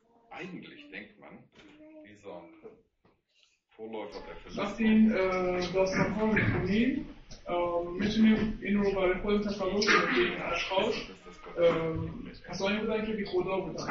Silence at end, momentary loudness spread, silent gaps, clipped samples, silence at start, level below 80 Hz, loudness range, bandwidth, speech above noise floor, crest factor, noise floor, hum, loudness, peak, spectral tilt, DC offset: 0 s; 21 LU; none; under 0.1%; 0.3 s; -50 dBFS; 20 LU; 7.2 kHz; 40 dB; 20 dB; -70 dBFS; none; -29 LUFS; -10 dBFS; -6 dB/octave; under 0.1%